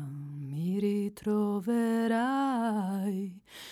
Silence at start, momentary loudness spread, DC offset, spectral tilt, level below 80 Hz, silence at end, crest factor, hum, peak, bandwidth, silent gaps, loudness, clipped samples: 0 s; 12 LU; under 0.1%; -7 dB/octave; -72 dBFS; 0 s; 12 dB; none; -20 dBFS; 14.5 kHz; none; -31 LUFS; under 0.1%